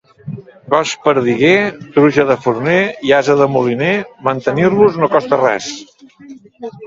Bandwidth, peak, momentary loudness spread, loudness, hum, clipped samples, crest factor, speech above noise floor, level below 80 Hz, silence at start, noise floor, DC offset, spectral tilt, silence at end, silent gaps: 7.8 kHz; 0 dBFS; 19 LU; -13 LUFS; none; under 0.1%; 14 dB; 25 dB; -54 dBFS; 0.25 s; -38 dBFS; under 0.1%; -5.5 dB/octave; 0 s; none